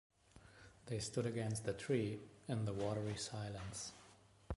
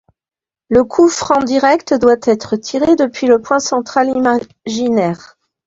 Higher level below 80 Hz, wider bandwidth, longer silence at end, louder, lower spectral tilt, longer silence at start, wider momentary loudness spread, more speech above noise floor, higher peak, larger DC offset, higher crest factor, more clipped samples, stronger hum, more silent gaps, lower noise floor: second, -62 dBFS vs -50 dBFS; first, 11.5 kHz vs 7.8 kHz; second, 0 s vs 0.5 s; second, -43 LUFS vs -14 LUFS; about the same, -5.5 dB/octave vs -4.5 dB/octave; second, 0.35 s vs 0.7 s; first, 21 LU vs 7 LU; second, 24 dB vs over 77 dB; second, -24 dBFS vs 0 dBFS; neither; first, 20 dB vs 14 dB; neither; neither; neither; second, -66 dBFS vs under -90 dBFS